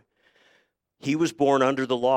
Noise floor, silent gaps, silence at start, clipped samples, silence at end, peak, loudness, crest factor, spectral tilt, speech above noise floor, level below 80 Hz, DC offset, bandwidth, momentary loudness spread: -66 dBFS; none; 1.05 s; under 0.1%; 0 s; -8 dBFS; -24 LUFS; 18 dB; -5.5 dB/octave; 44 dB; -70 dBFS; under 0.1%; 15 kHz; 8 LU